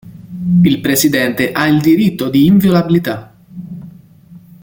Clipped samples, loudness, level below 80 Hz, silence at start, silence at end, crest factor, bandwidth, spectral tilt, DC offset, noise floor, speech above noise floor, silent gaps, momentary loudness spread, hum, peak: under 0.1%; -12 LUFS; -46 dBFS; 0.05 s; 0.25 s; 12 dB; 17 kHz; -5.5 dB/octave; under 0.1%; -40 dBFS; 28 dB; none; 20 LU; none; 0 dBFS